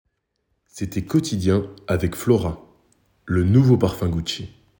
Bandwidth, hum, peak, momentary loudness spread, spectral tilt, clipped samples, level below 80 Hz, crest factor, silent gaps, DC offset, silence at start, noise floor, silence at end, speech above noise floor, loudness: 18.5 kHz; none; -2 dBFS; 13 LU; -7 dB/octave; under 0.1%; -42 dBFS; 18 dB; none; under 0.1%; 0.75 s; -73 dBFS; 0.3 s; 53 dB; -21 LUFS